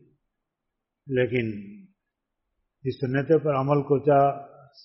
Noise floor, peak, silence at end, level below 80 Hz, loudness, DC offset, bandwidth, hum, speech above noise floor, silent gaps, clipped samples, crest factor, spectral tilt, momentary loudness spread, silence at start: -83 dBFS; -8 dBFS; 0.4 s; -62 dBFS; -24 LUFS; under 0.1%; 5.8 kHz; none; 60 dB; none; under 0.1%; 18 dB; -7 dB/octave; 14 LU; 1.05 s